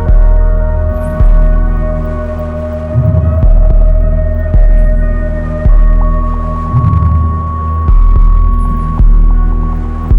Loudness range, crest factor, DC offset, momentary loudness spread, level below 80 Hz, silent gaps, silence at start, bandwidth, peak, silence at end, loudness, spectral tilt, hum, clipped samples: 1 LU; 8 dB; under 0.1%; 6 LU; -8 dBFS; none; 0 s; 2.6 kHz; 0 dBFS; 0 s; -12 LUFS; -10.5 dB/octave; none; under 0.1%